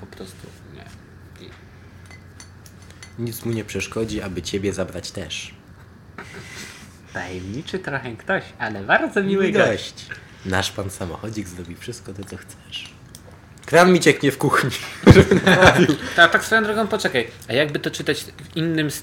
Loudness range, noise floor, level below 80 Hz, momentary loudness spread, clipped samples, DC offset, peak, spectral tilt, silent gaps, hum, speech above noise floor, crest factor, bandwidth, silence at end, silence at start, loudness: 16 LU; -45 dBFS; -42 dBFS; 23 LU; under 0.1%; under 0.1%; 0 dBFS; -5 dB/octave; none; none; 25 dB; 20 dB; 17 kHz; 0 s; 0 s; -19 LUFS